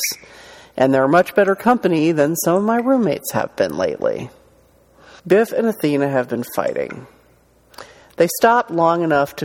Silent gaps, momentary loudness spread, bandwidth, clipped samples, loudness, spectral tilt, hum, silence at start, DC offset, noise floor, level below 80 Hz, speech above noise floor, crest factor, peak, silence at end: none; 9 LU; 18 kHz; under 0.1%; -17 LUFS; -5 dB/octave; none; 0 s; under 0.1%; -54 dBFS; -58 dBFS; 37 dB; 18 dB; -2 dBFS; 0 s